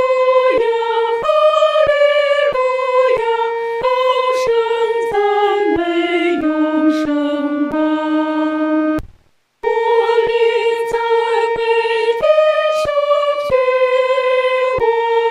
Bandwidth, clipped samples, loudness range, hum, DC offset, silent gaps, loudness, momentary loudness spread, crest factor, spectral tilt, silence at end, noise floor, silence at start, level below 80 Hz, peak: 11.5 kHz; under 0.1%; 3 LU; none; under 0.1%; none; -15 LUFS; 5 LU; 12 dB; -4.5 dB/octave; 0 s; -52 dBFS; 0 s; -48 dBFS; -2 dBFS